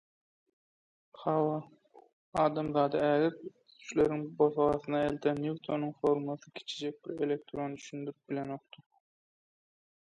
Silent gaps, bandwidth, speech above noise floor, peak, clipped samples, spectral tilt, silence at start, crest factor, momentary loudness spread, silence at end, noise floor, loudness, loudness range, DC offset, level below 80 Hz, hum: 2.13-2.32 s; 9.4 kHz; over 58 dB; -14 dBFS; under 0.1%; -6.5 dB/octave; 1.15 s; 20 dB; 13 LU; 1.5 s; under -90 dBFS; -33 LUFS; 9 LU; under 0.1%; -66 dBFS; none